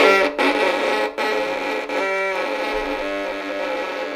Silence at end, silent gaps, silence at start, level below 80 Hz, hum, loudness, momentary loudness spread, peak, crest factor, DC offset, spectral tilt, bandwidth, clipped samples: 0 s; none; 0 s; -50 dBFS; none; -21 LUFS; 7 LU; 0 dBFS; 20 dB; under 0.1%; -3 dB/octave; 16 kHz; under 0.1%